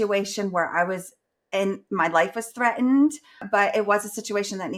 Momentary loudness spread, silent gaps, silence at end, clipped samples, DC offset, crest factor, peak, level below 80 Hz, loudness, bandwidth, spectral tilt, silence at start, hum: 8 LU; none; 0 s; under 0.1%; under 0.1%; 18 dB; -6 dBFS; -72 dBFS; -24 LUFS; 15.5 kHz; -4.5 dB/octave; 0 s; none